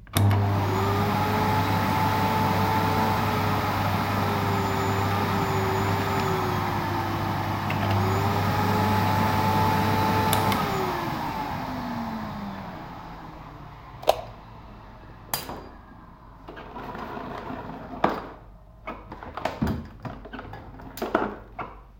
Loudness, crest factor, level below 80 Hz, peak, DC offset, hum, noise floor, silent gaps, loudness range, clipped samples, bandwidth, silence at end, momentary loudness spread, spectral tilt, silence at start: -25 LUFS; 24 dB; -46 dBFS; -2 dBFS; under 0.1%; none; -47 dBFS; none; 11 LU; under 0.1%; 16.5 kHz; 0.05 s; 18 LU; -6 dB/octave; 0 s